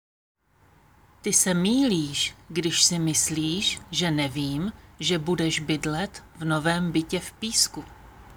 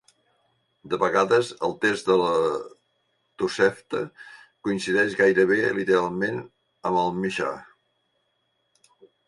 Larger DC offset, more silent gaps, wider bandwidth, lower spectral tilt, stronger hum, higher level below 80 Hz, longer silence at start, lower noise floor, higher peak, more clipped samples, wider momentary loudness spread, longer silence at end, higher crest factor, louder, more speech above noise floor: neither; neither; first, over 20 kHz vs 11.5 kHz; second, -3 dB/octave vs -5 dB/octave; neither; first, -52 dBFS vs -64 dBFS; first, 1.25 s vs 0.85 s; second, -60 dBFS vs -73 dBFS; about the same, -4 dBFS vs -6 dBFS; neither; about the same, 11 LU vs 13 LU; second, 0.05 s vs 1.65 s; about the same, 22 dB vs 20 dB; about the same, -24 LUFS vs -24 LUFS; second, 34 dB vs 49 dB